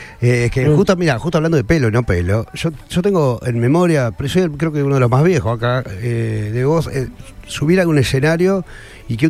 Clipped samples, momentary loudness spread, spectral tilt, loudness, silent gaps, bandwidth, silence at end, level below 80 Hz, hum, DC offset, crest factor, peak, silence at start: under 0.1%; 9 LU; -7 dB/octave; -16 LUFS; none; 15 kHz; 0 s; -36 dBFS; none; under 0.1%; 14 dB; -2 dBFS; 0 s